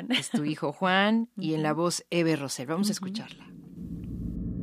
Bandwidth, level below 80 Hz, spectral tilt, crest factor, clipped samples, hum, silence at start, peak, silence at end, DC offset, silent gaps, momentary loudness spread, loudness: 15.5 kHz; -48 dBFS; -4.5 dB/octave; 20 dB; under 0.1%; none; 0 s; -8 dBFS; 0 s; under 0.1%; none; 16 LU; -28 LUFS